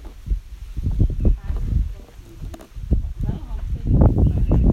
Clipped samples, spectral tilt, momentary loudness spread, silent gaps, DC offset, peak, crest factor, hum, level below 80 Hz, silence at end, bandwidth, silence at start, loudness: under 0.1%; -10 dB/octave; 20 LU; none; under 0.1%; -4 dBFS; 16 dB; none; -22 dBFS; 0 s; 6.8 kHz; 0 s; -23 LUFS